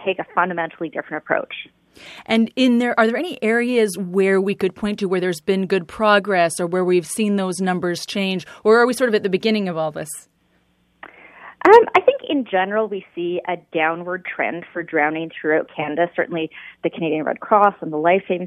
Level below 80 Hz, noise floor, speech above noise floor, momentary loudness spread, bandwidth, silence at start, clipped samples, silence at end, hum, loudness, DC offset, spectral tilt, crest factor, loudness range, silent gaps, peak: -62 dBFS; -62 dBFS; 43 dB; 11 LU; 14 kHz; 0 s; under 0.1%; 0 s; none; -19 LUFS; under 0.1%; -5 dB/octave; 20 dB; 4 LU; none; 0 dBFS